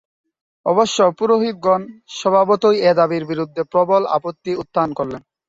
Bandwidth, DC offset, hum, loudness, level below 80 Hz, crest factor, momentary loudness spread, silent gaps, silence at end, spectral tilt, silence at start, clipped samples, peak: 7.8 kHz; under 0.1%; none; -17 LUFS; -60 dBFS; 14 dB; 11 LU; none; 0.3 s; -5 dB/octave; 0.65 s; under 0.1%; -2 dBFS